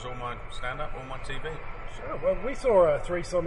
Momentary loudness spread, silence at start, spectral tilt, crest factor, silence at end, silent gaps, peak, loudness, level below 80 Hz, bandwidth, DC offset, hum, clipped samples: 16 LU; 0 s; -5.5 dB/octave; 18 dB; 0 s; none; -10 dBFS; -29 LUFS; -42 dBFS; 11 kHz; under 0.1%; none; under 0.1%